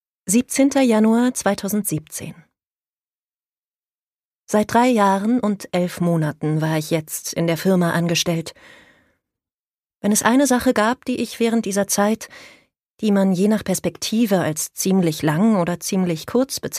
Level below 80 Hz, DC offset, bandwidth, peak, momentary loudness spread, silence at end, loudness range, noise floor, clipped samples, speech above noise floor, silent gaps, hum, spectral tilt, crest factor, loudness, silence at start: -56 dBFS; under 0.1%; 15.5 kHz; -2 dBFS; 8 LU; 0 s; 3 LU; under -90 dBFS; under 0.1%; over 71 dB; 2.93-2.97 s, 3.18-3.33 s, 3.58-3.71 s, 3.95-4.17 s, 4.25-4.39 s, 9.54-9.58 s, 9.67-9.71 s, 12.91-12.96 s; none; -5 dB/octave; 18 dB; -19 LUFS; 0.25 s